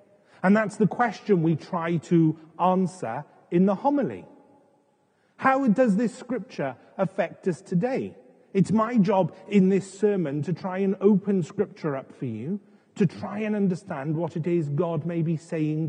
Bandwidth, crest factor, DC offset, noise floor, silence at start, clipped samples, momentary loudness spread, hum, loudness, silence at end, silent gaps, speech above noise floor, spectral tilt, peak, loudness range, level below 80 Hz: 9.8 kHz; 18 dB; under 0.1%; -66 dBFS; 0.45 s; under 0.1%; 11 LU; none; -25 LUFS; 0 s; none; 42 dB; -8 dB/octave; -6 dBFS; 4 LU; -84 dBFS